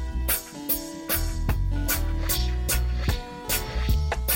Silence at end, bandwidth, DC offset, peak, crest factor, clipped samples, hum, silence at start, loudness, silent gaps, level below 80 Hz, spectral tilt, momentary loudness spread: 0 s; 17 kHz; under 0.1%; -10 dBFS; 16 dB; under 0.1%; none; 0 s; -27 LUFS; none; -28 dBFS; -3.5 dB/octave; 3 LU